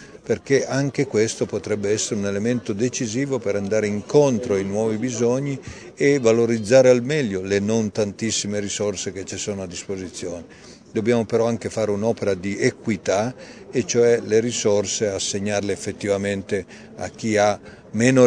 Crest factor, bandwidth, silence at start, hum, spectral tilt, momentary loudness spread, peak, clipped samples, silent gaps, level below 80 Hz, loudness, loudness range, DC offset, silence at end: 20 dB; 10 kHz; 0 s; none; -5 dB/octave; 11 LU; -2 dBFS; under 0.1%; none; -58 dBFS; -22 LUFS; 5 LU; under 0.1%; 0 s